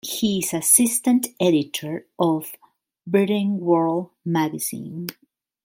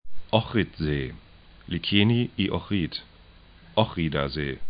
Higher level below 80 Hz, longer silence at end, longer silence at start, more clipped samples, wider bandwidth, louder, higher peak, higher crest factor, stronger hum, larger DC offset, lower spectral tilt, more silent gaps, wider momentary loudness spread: second, -64 dBFS vs -44 dBFS; first, 0.5 s vs 0 s; about the same, 0.05 s vs 0.05 s; neither; first, 17 kHz vs 5.2 kHz; first, -21 LUFS vs -26 LUFS; about the same, -2 dBFS vs -4 dBFS; about the same, 20 dB vs 22 dB; neither; neither; second, -4 dB/octave vs -10.5 dB/octave; neither; first, 16 LU vs 10 LU